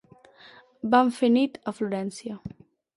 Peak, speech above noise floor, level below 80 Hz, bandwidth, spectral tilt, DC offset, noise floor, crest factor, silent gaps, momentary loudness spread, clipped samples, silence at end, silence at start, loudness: -6 dBFS; 29 dB; -64 dBFS; 11.5 kHz; -5.5 dB/octave; under 0.1%; -53 dBFS; 20 dB; none; 17 LU; under 0.1%; 0.45 s; 0.85 s; -25 LUFS